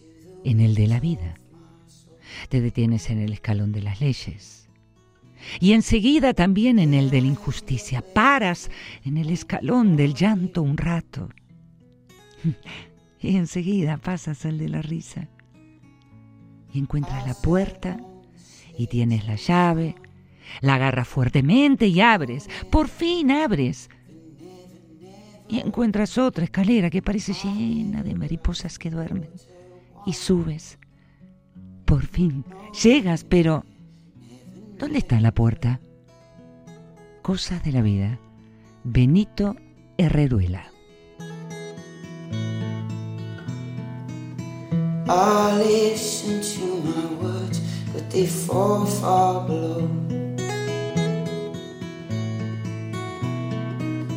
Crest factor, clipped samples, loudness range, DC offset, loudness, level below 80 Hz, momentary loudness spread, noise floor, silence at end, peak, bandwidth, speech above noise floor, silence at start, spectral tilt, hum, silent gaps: 20 dB; under 0.1%; 9 LU; under 0.1%; -23 LUFS; -40 dBFS; 16 LU; -56 dBFS; 0 s; -2 dBFS; 16 kHz; 35 dB; 0.3 s; -6.5 dB/octave; none; none